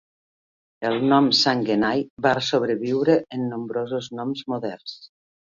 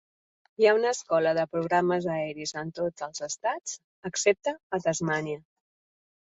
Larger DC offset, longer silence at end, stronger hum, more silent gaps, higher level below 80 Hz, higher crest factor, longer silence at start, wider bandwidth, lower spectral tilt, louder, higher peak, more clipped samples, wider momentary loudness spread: neither; second, 0.45 s vs 1 s; neither; second, 2.10-2.17 s vs 3.84-4.03 s, 4.63-4.70 s; first, -64 dBFS vs -70 dBFS; about the same, 20 dB vs 20 dB; first, 0.8 s vs 0.6 s; second, 7.6 kHz vs 8.4 kHz; about the same, -5 dB/octave vs -4 dB/octave; first, -22 LUFS vs -28 LUFS; first, -4 dBFS vs -8 dBFS; neither; about the same, 12 LU vs 11 LU